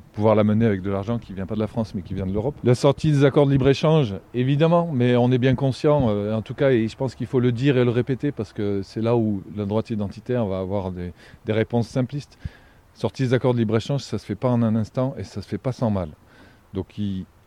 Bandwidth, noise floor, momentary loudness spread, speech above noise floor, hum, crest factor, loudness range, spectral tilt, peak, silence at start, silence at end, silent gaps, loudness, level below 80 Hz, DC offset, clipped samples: 10.5 kHz; -51 dBFS; 11 LU; 29 dB; none; 18 dB; 7 LU; -8 dB/octave; -4 dBFS; 0.15 s; 0.2 s; none; -22 LUFS; -48 dBFS; under 0.1%; under 0.1%